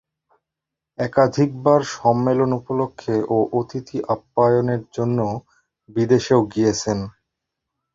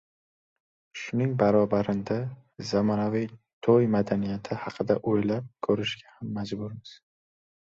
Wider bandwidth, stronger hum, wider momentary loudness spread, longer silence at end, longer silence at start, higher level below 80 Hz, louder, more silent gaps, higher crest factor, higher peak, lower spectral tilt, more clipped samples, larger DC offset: about the same, 7.8 kHz vs 7.6 kHz; neither; second, 10 LU vs 15 LU; about the same, 0.85 s vs 0.8 s; about the same, 1 s vs 0.95 s; first, -54 dBFS vs -60 dBFS; first, -20 LUFS vs -27 LUFS; second, none vs 3.53-3.61 s; about the same, 18 dB vs 20 dB; first, -2 dBFS vs -8 dBFS; about the same, -6.5 dB/octave vs -7.5 dB/octave; neither; neither